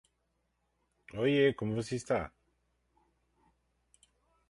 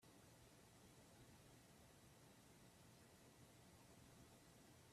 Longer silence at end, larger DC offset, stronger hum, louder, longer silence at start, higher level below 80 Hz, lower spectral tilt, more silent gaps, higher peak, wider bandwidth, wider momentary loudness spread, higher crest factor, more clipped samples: first, 2.2 s vs 0 s; neither; neither; first, -32 LUFS vs -68 LUFS; first, 1.15 s vs 0 s; first, -64 dBFS vs -82 dBFS; first, -6 dB/octave vs -4 dB/octave; neither; first, -14 dBFS vs -54 dBFS; second, 11.5 kHz vs 14.5 kHz; first, 15 LU vs 1 LU; first, 22 dB vs 14 dB; neither